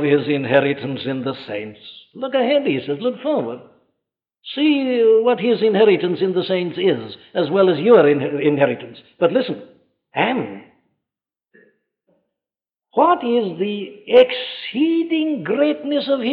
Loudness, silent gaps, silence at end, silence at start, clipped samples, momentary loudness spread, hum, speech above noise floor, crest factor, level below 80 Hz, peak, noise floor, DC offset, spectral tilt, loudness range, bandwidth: -18 LUFS; none; 0 s; 0 s; under 0.1%; 15 LU; none; 72 dB; 18 dB; -70 dBFS; -2 dBFS; -90 dBFS; under 0.1%; -9 dB/octave; 8 LU; 5 kHz